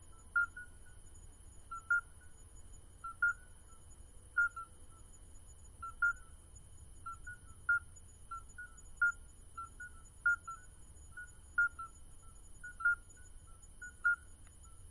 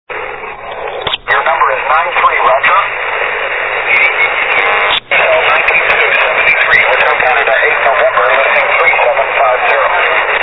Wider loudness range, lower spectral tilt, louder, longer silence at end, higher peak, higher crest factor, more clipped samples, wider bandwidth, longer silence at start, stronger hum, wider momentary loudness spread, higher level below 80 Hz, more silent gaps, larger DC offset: about the same, 2 LU vs 3 LU; second, -2.5 dB/octave vs -4 dB/octave; second, -37 LUFS vs -9 LUFS; about the same, 0 s vs 0 s; second, -24 dBFS vs 0 dBFS; first, 18 dB vs 10 dB; second, under 0.1% vs 0.1%; first, 11.5 kHz vs 5.4 kHz; about the same, 0 s vs 0.1 s; neither; first, 24 LU vs 6 LU; second, -58 dBFS vs -42 dBFS; neither; second, under 0.1% vs 0.7%